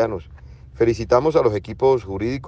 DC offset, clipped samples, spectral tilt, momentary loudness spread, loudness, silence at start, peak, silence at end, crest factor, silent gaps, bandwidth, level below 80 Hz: under 0.1%; under 0.1%; -7.5 dB/octave; 8 LU; -19 LUFS; 0 s; -4 dBFS; 0 s; 16 dB; none; 7.8 kHz; -42 dBFS